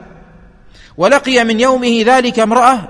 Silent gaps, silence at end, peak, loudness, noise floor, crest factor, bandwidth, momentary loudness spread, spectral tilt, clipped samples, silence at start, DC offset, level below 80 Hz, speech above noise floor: none; 0 s; 0 dBFS; -11 LUFS; -41 dBFS; 12 dB; 11 kHz; 2 LU; -4 dB/octave; 0.1%; 1 s; under 0.1%; -44 dBFS; 30 dB